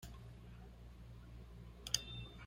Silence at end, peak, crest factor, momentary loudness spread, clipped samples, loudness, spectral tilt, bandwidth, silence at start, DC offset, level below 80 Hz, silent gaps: 0 s; -16 dBFS; 34 dB; 17 LU; under 0.1%; -46 LUFS; -2 dB/octave; 16 kHz; 0 s; under 0.1%; -58 dBFS; none